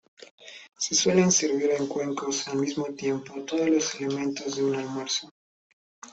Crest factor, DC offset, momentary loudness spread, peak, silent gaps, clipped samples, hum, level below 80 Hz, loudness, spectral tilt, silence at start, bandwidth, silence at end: 18 dB; under 0.1%; 11 LU; -8 dBFS; 0.31-0.38 s, 5.31-6.02 s; under 0.1%; none; -68 dBFS; -26 LUFS; -3.5 dB/octave; 0.2 s; 8.4 kHz; 0 s